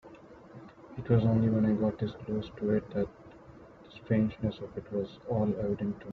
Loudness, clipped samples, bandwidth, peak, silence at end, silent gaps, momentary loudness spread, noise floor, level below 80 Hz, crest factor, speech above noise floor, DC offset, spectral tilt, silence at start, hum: -31 LUFS; under 0.1%; 4.9 kHz; -12 dBFS; 0 s; none; 24 LU; -52 dBFS; -56 dBFS; 18 dB; 23 dB; under 0.1%; -10 dB/octave; 0.05 s; none